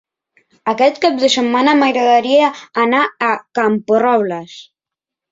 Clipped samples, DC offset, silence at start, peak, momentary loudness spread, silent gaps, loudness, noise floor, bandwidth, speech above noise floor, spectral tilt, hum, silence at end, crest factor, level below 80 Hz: under 0.1%; under 0.1%; 0.65 s; -2 dBFS; 9 LU; none; -14 LUFS; -85 dBFS; 7.8 kHz; 71 dB; -4 dB/octave; none; 0.7 s; 14 dB; -62 dBFS